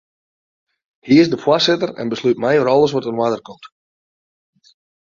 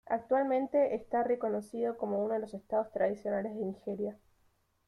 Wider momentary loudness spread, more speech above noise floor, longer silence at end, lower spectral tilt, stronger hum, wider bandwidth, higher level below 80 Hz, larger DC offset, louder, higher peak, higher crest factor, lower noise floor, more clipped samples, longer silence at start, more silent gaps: about the same, 7 LU vs 8 LU; first, over 74 dB vs 39 dB; first, 1.35 s vs 0.75 s; second, -5.5 dB/octave vs -8 dB/octave; neither; second, 7.4 kHz vs 12 kHz; first, -60 dBFS vs -72 dBFS; neither; first, -16 LUFS vs -33 LUFS; first, -2 dBFS vs -18 dBFS; about the same, 18 dB vs 16 dB; first, under -90 dBFS vs -72 dBFS; neither; first, 1.05 s vs 0.05 s; neither